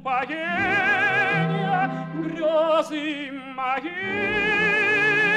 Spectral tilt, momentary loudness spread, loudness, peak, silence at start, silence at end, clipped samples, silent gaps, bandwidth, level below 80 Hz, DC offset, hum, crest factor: -5.5 dB/octave; 11 LU; -22 LUFS; -10 dBFS; 0 s; 0 s; under 0.1%; none; 12 kHz; -56 dBFS; under 0.1%; none; 12 dB